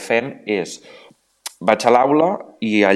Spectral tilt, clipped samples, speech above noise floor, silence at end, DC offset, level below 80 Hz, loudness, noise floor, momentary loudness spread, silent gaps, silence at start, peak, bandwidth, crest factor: -5 dB/octave; under 0.1%; 21 dB; 0 s; under 0.1%; -68 dBFS; -18 LUFS; -38 dBFS; 19 LU; none; 0 s; 0 dBFS; 13.5 kHz; 18 dB